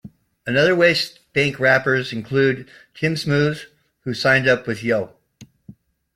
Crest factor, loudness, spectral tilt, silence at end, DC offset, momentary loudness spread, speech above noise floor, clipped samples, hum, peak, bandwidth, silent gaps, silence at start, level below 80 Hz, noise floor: 18 dB; -19 LUFS; -5.5 dB/octave; 0.7 s; under 0.1%; 14 LU; 30 dB; under 0.1%; none; -2 dBFS; 16 kHz; none; 0.05 s; -58 dBFS; -49 dBFS